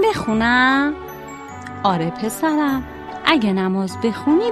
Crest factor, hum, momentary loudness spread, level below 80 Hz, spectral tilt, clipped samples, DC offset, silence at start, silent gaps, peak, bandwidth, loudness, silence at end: 18 dB; none; 18 LU; -46 dBFS; -5 dB/octave; under 0.1%; under 0.1%; 0 s; none; 0 dBFS; 13 kHz; -18 LUFS; 0 s